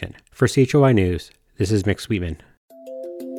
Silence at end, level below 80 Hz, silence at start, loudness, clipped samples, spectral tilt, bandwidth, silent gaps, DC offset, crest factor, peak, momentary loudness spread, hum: 0 s; -42 dBFS; 0 s; -20 LUFS; under 0.1%; -6.5 dB/octave; 15.5 kHz; 2.57-2.69 s; under 0.1%; 16 dB; -6 dBFS; 19 LU; none